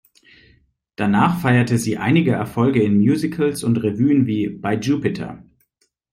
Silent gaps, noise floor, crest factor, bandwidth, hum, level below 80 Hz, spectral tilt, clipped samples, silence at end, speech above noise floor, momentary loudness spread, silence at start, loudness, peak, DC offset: none; -67 dBFS; 16 dB; 16 kHz; none; -54 dBFS; -7 dB/octave; under 0.1%; 0.7 s; 50 dB; 7 LU; 1 s; -18 LUFS; -4 dBFS; under 0.1%